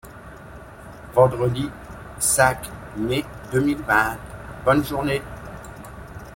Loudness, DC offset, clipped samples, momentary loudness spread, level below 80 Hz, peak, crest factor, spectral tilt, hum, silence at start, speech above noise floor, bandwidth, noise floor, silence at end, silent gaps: -21 LUFS; under 0.1%; under 0.1%; 23 LU; -44 dBFS; -2 dBFS; 20 dB; -4.5 dB/octave; none; 0.05 s; 20 dB; 16.5 kHz; -41 dBFS; 0 s; none